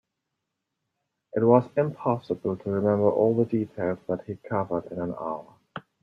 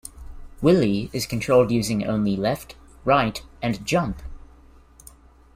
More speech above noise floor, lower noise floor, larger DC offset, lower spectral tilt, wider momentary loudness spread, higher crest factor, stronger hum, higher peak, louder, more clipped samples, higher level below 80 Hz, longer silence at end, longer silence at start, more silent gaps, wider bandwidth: first, 57 dB vs 28 dB; first, -82 dBFS vs -50 dBFS; neither; first, -10.5 dB/octave vs -6 dB/octave; about the same, 13 LU vs 13 LU; about the same, 22 dB vs 18 dB; neither; about the same, -6 dBFS vs -4 dBFS; second, -26 LUFS vs -22 LUFS; neither; second, -66 dBFS vs -44 dBFS; second, 0.2 s vs 1.15 s; first, 1.35 s vs 0.05 s; neither; second, 5.8 kHz vs 16 kHz